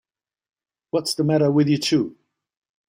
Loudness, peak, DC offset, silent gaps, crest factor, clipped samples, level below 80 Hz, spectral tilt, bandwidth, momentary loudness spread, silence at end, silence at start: -21 LUFS; -8 dBFS; under 0.1%; none; 16 dB; under 0.1%; -62 dBFS; -6 dB/octave; 16 kHz; 8 LU; 0.75 s; 0.95 s